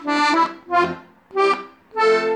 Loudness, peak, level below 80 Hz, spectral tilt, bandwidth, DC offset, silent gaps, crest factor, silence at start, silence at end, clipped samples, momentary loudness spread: -20 LUFS; -6 dBFS; -64 dBFS; -4 dB/octave; 10.5 kHz; under 0.1%; none; 14 dB; 0 s; 0 s; under 0.1%; 11 LU